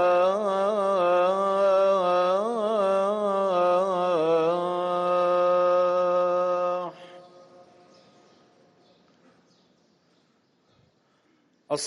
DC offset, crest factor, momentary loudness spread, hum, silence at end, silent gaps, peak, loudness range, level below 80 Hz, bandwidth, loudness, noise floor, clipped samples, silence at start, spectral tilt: under 0.1%; 12 dB; 5 LU; none; 0 s; none; -12 dBFS; 8 LU; -76 dBFS; 10.5 kHz; -23 LUFS; -66 dBFS; under 0.1%; 0 s; -5 dB/octave